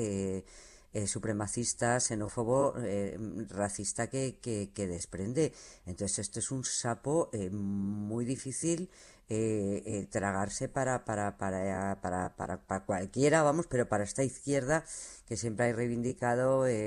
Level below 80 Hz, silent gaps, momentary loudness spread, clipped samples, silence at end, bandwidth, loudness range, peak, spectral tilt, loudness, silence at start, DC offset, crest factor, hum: -60 dBFS; none; 8 LU; under 0.1%; 0 s; 12 kHz; 3 LU; -14 dBFS; -5 dB/octave; -33 LUFS; 0 s; under 0.1%; 18 dB; none